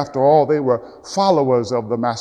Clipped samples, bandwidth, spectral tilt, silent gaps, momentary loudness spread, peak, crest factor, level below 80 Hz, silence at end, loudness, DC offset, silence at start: under 0.1%; 10 kHz; -6 dB/octave; none; 8 LU; -2 dBFS; 14 dB; -58 dBFS; 0 s; -17 LUFS; under 0.1%; 0 s